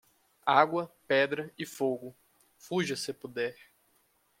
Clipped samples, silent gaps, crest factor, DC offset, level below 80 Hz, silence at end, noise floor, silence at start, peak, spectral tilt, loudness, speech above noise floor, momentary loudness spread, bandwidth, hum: under 0.1%; none; 26 dB; under 0.1%; -78 dBFS; 0.9 s; -70 dBFS; 0.45 s; -6 dBFS; -4.5 dB/octave; -31 LUFS; 40 dB; 12 LU; 16.5 kHz; none